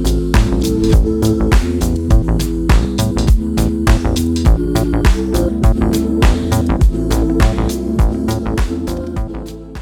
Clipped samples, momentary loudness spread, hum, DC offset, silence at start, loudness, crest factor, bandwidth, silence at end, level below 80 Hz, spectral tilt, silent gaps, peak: under 0.1%; 5 LU; none; under 0.1%; 0 s; -15 LUFS; 14 dB; 17 kHz; 0 s; -16 dBFS; -6.5 dB/octave; none; 0 dBFS